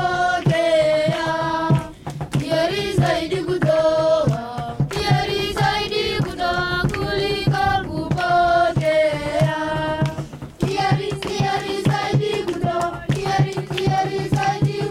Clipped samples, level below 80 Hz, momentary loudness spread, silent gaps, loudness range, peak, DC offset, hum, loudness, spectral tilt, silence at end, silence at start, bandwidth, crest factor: under 0.1%; -42 dBFS; 7 LU; none; 2 LU; -4 dBFS; under 0.1%; none; -20 LUFS; -6 dB/octave; 0 s; 0 s; 14 kHz; 16 dB